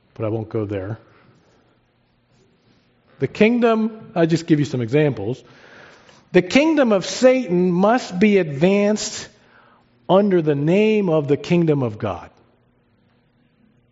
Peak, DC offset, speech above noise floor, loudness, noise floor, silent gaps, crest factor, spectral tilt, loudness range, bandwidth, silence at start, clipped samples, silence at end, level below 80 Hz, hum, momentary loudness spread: -2 dBFS; under 0.1%; 44 dB; -18 LUFS; -62 dBFS; none; 18 dB; -6 dB/octave; 6 LU; 8 kHz; 0.2 s; under 0.1%; 1.65 s; -60 dBFS; none; 12 LU